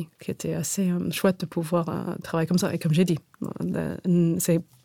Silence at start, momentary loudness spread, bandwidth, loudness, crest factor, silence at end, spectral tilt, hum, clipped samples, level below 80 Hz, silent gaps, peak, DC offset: 0 s; 9 LU; 17.5 kHz; -26 LUFS; 16 dB; 0.25 s; -6 dB/octave; none; under 0.1%; -60 dBFS; none; -8 dBFS; under 0.1%